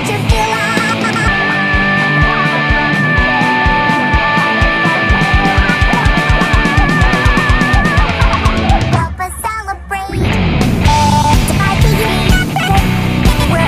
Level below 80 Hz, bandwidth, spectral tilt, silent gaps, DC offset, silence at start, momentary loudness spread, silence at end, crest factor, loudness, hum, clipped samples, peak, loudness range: -18 dBFS; 15.5 kHz; -5 dB/octave; none; under 0.1%; 0 s; 3 LU; 0 s; 12 dB; -12 LUFS; none; under 0.1%; 0 dBFS; 3 LU